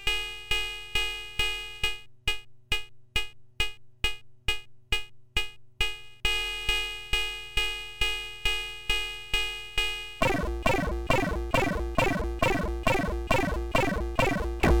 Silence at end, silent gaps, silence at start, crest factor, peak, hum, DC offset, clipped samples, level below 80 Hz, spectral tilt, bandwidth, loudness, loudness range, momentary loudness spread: 0 s; none; 0 s; 20 dB; -10 dBFS; none; under 0.1%; under 0.1%; -36 dBFS; -4 dB/octave; 19 kHz; -29 LUFS; 5 LU; 5 LU